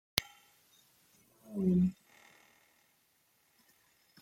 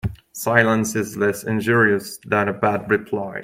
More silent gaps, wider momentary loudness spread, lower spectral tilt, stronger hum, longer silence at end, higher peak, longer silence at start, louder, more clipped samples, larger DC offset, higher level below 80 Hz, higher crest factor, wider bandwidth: neither; first, 26 LU vs 8 LU; about the same, -5.5 dB/octave vs -5.5 dB/octave; neither; first, 2.3 s vs 0 s; about the same, -2 dBFS vs 0 dBFS; about the same, 0.15 s vs 0.05 s; second, -33 LUFS vs -20 LUFS; neither; neither; second, -66 dBFS vs -48 dBFS; first, 36 dB vs 20 dB; about the same, 16.5 kHz vs 16.5 kHz